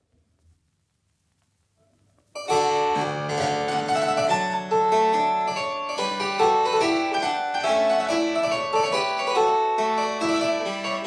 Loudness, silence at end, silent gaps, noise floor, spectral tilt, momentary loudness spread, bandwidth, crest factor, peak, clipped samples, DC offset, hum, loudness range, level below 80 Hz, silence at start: -23 LUFS; 0 s; none; -71 dBFS; -3.5 dB/octave; 6 LU; 11 kHz; 16 dB; -8 dBFS; under 0.1%; under 0.1%; none; 5 LU; -66 dBFS; 2.35 s